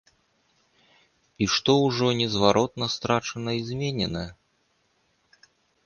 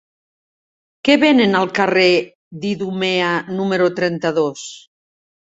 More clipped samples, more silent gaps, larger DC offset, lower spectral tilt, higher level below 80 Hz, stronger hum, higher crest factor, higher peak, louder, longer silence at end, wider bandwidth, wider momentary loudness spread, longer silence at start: neither; second, none vs 2.35-2.51 s; neither; about the same, -5 dB/octave vs -5 dB/octave; first, -54 dBFS vs -60 dBFS; neither; first, 24 dB vs 16 dB; about the same, -2 dBFS vs -2 dBFS; second, -24 LUFS vs -17 LUFS; first, 1.55 s vs 0.8 s; first, 10 kHz vs 8 kHz; second, 9 LU vs 12 LU; first, 1.4 s vs 1.05 s